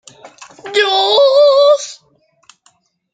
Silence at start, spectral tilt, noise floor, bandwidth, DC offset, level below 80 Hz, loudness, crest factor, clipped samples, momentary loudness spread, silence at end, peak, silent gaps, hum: 0.25 s; 0 dB/octave; -56 dBFS; 9.2 kHz; under 0.1%; -70 dBFS; -11 LUFS; 14 dB; under 0.1%; 15 LU; 1.2 s; 0 dBFS; none; none